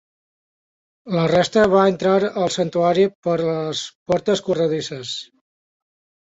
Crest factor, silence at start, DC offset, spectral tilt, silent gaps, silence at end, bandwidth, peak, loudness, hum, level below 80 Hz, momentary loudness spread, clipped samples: 18 dB; 1.05 s; under 0.1%; -5.5 dB/octave; 3.15-3.23 s, 3.95-4.06 s; 1.1 s; 8 kHz; -4 dBFS; -19 LUFS; none; -56 dBFS; 11 LU; under 0.1%